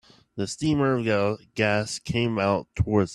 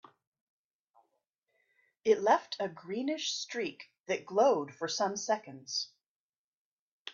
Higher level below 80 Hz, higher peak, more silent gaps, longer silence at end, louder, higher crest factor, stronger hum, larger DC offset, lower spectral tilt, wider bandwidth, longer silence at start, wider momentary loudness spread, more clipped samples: first, -48 dBFS vs -86 dBFS; first, -8 dBFS vs -12 dBFS; second, none vs 4.00-4.04 s, 6.06-7.05 s; about the same, 0 s vs 0 s; first, -25 LUFS vs -32 LUFS; about the same, 18 dB vs 22 dB; neither; neither; first, -5.5 dB/octave vs -2.5 dB/octave; first, 12 kHz vs 7.6 kHz; second, 0.35 s vs 2.05 s; second, 6 LU vs 11 LU; neither